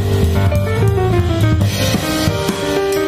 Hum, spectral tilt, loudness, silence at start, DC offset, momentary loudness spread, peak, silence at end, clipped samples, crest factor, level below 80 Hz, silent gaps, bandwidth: none; -6 dB/octave; -15 LUFS; 0 s; under 0.1%; 3 LU; -2 dBFS; 0 s; under 0.1%; 12 dB; -26 dBFS; none; 15.5 kHz